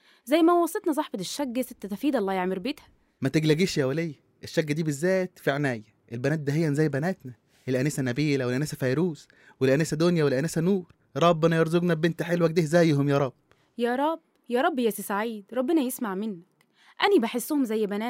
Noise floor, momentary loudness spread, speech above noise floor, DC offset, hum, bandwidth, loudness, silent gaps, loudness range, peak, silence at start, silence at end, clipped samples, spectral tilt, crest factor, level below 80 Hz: -60 dBFS; 10 LU; 35 dB; under 0.1%; none; 16 kHz; -26 LUFS; none; 4 LU; -8 dBFS; 0.25 s; 0 s; under 0.1%; -6 dB/octave; 18 dB; -66 dBFS